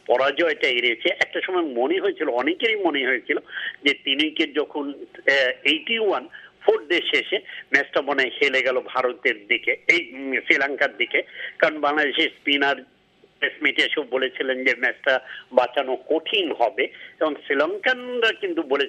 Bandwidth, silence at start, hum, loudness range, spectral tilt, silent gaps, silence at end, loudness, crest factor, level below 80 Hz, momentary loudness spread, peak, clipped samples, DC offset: 9.4 kHz; 0.1 s; none; 2 LU; -3 dB/octave; none; 0 s; -22 LUFS; 22 dB; -74 dBFS; 7 LU; 0 dBFS; under 0.1%; under 0.1%